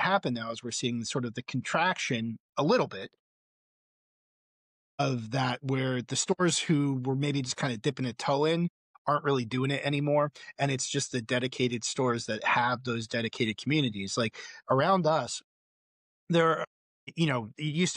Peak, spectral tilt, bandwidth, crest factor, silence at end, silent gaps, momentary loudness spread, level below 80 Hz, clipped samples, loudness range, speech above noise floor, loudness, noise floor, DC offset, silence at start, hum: -14 dBFS; -4.5 dB/octave; 11 kHz; 16 dB; 0 s; 2.40-2.53 s, 3.19-4.98 s, 8.70-9.05 s, 15.44-16.27 s, 16.67-17.07 s; 8 LU; -72 dBFS; under 0.1%; 4 LU; over 61 dB; -29 LUFS; under -90 dBFS; under 0.1%; 0 s; none